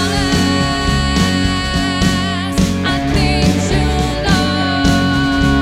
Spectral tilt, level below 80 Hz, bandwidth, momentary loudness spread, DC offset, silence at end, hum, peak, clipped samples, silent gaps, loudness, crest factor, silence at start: -5 dB/octave; -24 dBFS; 16 kHz; 3 LU; under 0.1%; 0 s; none; 0 dBFS; under 0.1%; none; -15 LUFS; 14 dB; 0 s